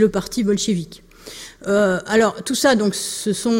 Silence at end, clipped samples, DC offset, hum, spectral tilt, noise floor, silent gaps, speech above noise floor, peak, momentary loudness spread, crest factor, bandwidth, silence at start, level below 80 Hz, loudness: 0 s; under 0.1%; under 0.1%; none; -4 dB/octave; -38 dBFS; none; 20 dB; -4 dBFS; 19 LU; 16 dB; 16.5 kHz; 0 s; -50 dBFS; -19 LUFS